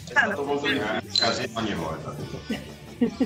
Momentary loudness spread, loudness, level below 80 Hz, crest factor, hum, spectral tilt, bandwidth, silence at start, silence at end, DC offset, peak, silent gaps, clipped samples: 12 LU; -26 LUFS; -52 dBFS; 20 dB; none; -4 dB/octave; 16 kHz; 0 s; 0 s; under 0.1%; -8 dBFS; none; under 0.1%